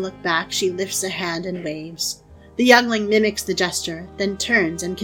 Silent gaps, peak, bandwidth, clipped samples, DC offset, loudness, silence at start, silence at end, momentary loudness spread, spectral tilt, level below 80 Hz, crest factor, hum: none; 0 dBFS; 18.5 kHz; under 0.1%; under 0.1%; -20 LUFS; 0 s; 0 s; 14 LU; -3 dB/octave; -50 dBFS; 22 dB; none